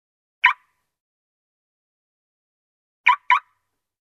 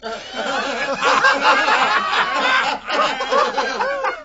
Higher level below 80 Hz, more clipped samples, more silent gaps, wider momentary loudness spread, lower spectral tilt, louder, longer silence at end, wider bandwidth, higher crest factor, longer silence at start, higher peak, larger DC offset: second, -86 dBFS vs -52 dBFS; neither; first, 1.00-3.04 s vs none; second, 3 LU vs 8 LU; second, 3 dB/octave vs -1.5 dB/octave; about the same, -19 LUFS vs -17 LUFS; first, 0.75 s vs 0 s; first, 11.5 kHz vs 8 kHz; first, 26 dB vs 16 dB; first, 0.45 s vs 0 s; about the same, -2 dBFS vs -2 dBFS; neither